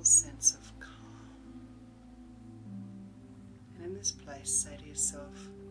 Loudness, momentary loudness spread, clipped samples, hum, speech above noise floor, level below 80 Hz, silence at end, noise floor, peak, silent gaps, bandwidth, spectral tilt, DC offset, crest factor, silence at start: -29 LUFS; 24 LU; under 0.1%; none; 16 dB; -58 dBFS; 0 s; -52 dBFS; -12 dBFS; none; 11 kHz; -1.5 dB/octave; under 0.1%; 22 dB; 0 s